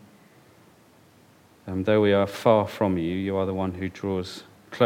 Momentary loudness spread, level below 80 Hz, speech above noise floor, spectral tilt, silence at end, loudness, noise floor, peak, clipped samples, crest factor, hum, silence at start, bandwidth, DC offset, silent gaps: 17 LU; -60 dBFS; 32 dB; -7 dB/octave; 0 s; -24 LUFS; -56 dBFS; -4 dBFS; under 0.1%; 22 dB; none; 1.65 s; 16.5 kHz; under 0.1%; none